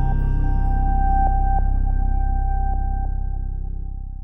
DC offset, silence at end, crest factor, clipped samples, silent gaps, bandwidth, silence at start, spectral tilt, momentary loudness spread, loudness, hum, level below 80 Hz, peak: under 0.1%; 0 s; 12 dB; under 0.1%; none; 1.7 kHz; 0 s; -11 dB/octave; 10 LU; -24 LUFS; none; -20 dBFS; -8 dBFS